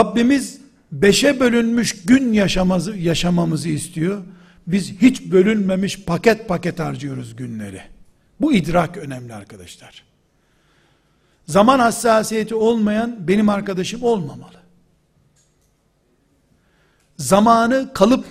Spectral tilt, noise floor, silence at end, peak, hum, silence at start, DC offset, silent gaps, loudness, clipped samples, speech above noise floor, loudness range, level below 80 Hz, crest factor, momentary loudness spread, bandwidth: -5.5 dB/octave; -62 dBFS; 0 s; 0 dBFS; none; 0 s; under 0.1%; none; -17 LUFS; under 0.1%; 45 dB; 7 LU; -42 dBFS; 18 dB; 17 LU; 15.5 kHz